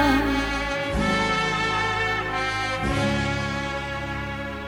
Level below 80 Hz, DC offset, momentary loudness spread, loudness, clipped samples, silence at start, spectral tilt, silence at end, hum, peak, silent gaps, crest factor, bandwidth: -36 dBFS; under 0.1%; 7 LU; -24 LUFS; under 0.1%; 0 s; -5 dB/octave; 0 s; none; -8 dBFS; none; 16 dB; 17.5 kHz